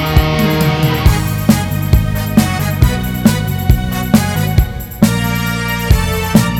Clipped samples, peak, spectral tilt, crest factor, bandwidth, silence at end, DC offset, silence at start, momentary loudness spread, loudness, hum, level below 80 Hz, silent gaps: 0.4%; 0 dBFS; -5.5 dB/octave; 12 dB; 19 kHz; 0 s; under 0.1%; 0 s; 3 LU; -14 LUFS; none; -20 dBFS; none